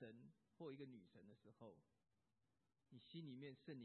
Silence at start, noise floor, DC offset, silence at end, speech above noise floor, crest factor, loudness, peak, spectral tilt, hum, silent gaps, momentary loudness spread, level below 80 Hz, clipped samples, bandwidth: 0 s; -90 dBFS; under 0.1%; 0 s; 30 dB; 16 dB; -61 LUFS; -44 dBFS; -6 dB/octave; none; none; 12 LU; under -90 dBFS; under 0.1%; 4.2 kHz